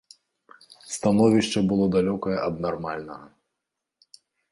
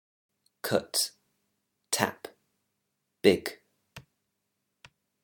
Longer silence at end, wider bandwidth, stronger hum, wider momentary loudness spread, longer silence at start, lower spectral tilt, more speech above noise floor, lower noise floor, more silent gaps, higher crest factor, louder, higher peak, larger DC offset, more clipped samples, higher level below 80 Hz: about the same, 1.25 s vs 1.25 s; second, 11.5 kHz vs 19 kHz; neither; about the same, 16 LU vs 15 LU; first, 0.85 s vs 0.65 s; first, -6 dB/octave vs -3 dB/octave; first, 61 dB vs 54 dB; about the same, -84 dBFS vs -81 dBFS; neither; second, 20 dB vs 28 dB; first, -24 LUFS vs -29 LUFS; about the same, -6 dBFS vs -6 dBFS; neither; neither; first, -56 dBFS vs -72 dBFS